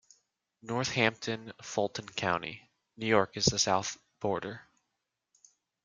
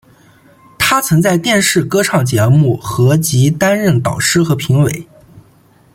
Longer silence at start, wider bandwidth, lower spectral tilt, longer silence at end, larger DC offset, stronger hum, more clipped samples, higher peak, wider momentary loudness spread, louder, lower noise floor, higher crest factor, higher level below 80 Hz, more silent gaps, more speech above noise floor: second, 0.65 s vs 0.8 s; second, 11 kHz vs 16.5 kHz; second, -3.5 dB/octave vs -5 dB/octave; first, 1.25 s vs 0.55 s; neither; neither; neither; second, -8 dBFS vs 0 dBFS; first, 15 LU vs 3 LU; second, -31 LUFS vs -12 LUFS; first, -84 dBFS vs -48 dBFS; first, 24 dB vs 14 dB; second, -66 dBFS vs -44 dBFS; neither; first, 53 dB vs 36 dB